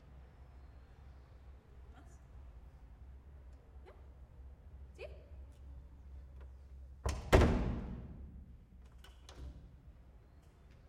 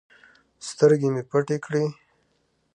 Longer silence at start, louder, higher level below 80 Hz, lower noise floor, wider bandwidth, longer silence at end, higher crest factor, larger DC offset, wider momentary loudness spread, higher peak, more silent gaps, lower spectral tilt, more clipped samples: second, 0 s vs 0.6 s; second, -36 LUFS vs -23 LUFS; first, -46 dBFS vs -72 dBFS; second, -60 dBFS vs -69 dBFS; first, 16 kHz vs 9.6 kHz; second, 0 s vs 0.85 s; first, 30 dB vs 20 dB; neither; first, 21 LU vs 14 LU; second, -10 dBFS vs -4 dBFS; neither; about the same, -6.5 dB/octave vs -6.5 dB/octave; neither